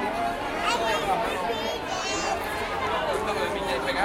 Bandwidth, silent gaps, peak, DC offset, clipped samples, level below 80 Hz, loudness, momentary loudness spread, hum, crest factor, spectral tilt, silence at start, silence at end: 16 kHz; none; -10 dBFS; under 0.1%; under 0.1%; -46 dBFS; -27 LUFS; 4 LU; none; 16 dB; -3 dB/octave; 0 s; 0 s